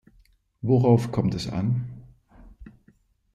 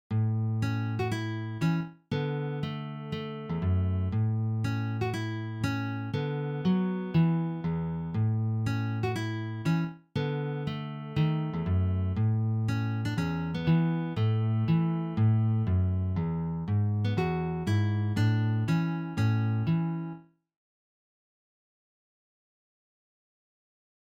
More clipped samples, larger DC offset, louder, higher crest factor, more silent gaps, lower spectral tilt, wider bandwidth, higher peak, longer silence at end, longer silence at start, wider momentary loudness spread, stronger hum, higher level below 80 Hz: neither; neither; first, -24 LUFS vs -30 LUFS; about the same, 18 dB vs 14 dB; neither; about the same, -8.5 dB/octave vs -8 dB/octave; first, 9.8 kHz vs 8 kHz; first, -8 dBFS vs -16 dBFS; second, 0.65 s vs 3.9 s; first, 0.65 s vs 0.1 s; first, 17 LU vs 7 LU; neither; about the same, -52 dBFS vs -54 dBFS